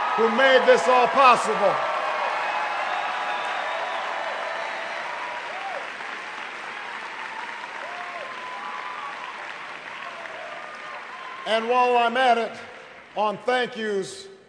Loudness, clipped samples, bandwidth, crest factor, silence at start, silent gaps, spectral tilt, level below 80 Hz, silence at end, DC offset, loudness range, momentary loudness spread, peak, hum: -24 LUFS; under 0.1%; 10.5 kHz; 22 dB; 0 s; none; -3 dB/octave; -76 dBFS; 0.1 s; under 0.1%; 13 LU; 18 LU; -4 dBFS; none